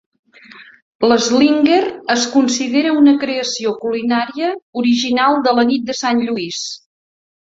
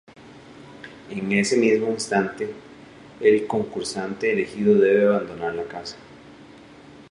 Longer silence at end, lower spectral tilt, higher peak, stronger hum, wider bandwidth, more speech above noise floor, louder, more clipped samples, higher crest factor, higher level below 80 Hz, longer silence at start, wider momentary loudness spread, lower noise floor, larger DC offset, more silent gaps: first, 0.8 s vs 0.1 s; second, -3 dB/octave vs -5 dB/octave; first, -2 dBFS vs -6 dBFS; neither; second, 7.8 kHz vs 11 kHz; about the same, 27 dB vs 24 dB; first, -15 LUFS vs -22 LUFS; neither; about the same, 14 dB vs 18 dB; about the same, -60 dBFS vs -62 dBFS; first, 0.55 s vs 0.2 s; second, 9 LU vs 19 LU; second, -41 dBFS vs -46 dBFS; neither; first, 0.82-0.99 s, 4.62-4.73 s vs none